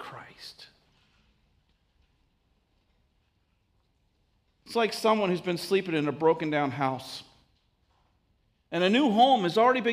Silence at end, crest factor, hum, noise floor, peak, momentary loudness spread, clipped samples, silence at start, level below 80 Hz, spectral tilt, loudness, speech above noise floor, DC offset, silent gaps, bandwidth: 0 s; 20 dB; none; -71 dBFS; -10 dBFS; 22 LU; under 0.1%; 0 s; -70 dBFS; -5.5 dB/octave; -26 LUFS; 46 dB; under 0.1%; none; 15.5 kHz